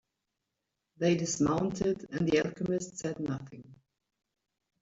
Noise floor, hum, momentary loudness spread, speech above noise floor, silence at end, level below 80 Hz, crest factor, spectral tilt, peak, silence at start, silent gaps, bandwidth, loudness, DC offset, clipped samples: -85 dBFS; none; 9 LU; 54 dB; 1.05 s; -62 dBFS; 20 dB; -5.5 dB/octave; -14 dBFS; 1 s; none; 8 kHz; -31 LUFS; under 0.1%; under 0.1%